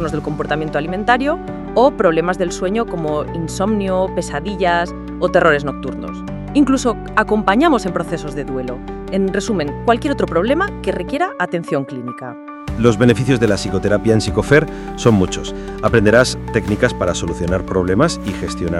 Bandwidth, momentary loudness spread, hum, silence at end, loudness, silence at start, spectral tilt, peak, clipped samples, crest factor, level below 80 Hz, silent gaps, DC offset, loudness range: 13 kHz; 11 LU; none; 0 s; -17 LUFS; 0 s; -6 dB/octave; 0 dBFS; under 0.1%; 16 dB; -34 dBFS; none; under 0.1%; 3 LU